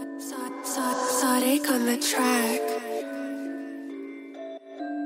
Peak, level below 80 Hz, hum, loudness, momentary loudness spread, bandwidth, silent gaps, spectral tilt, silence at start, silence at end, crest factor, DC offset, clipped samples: -10 dBFS; -84 dBFS; none; -26 LUFS; 16 LU; 16 kHz; none; -1.5 dB/octave; 0 s; 0 s; 18 dB; under 0.1%; under 0.1%